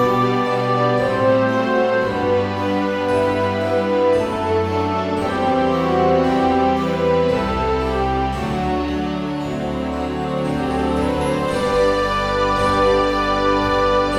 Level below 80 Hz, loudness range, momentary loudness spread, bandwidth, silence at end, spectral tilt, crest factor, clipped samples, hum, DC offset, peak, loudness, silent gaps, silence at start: -34 dBFS; 4 LU; 6 LU; 13 kHz; 0 s; -6.5 dB/octave; 14 dB; under 0.1%; none; 0.2%; -4 dBFS; -18 LUFS; none; 0 s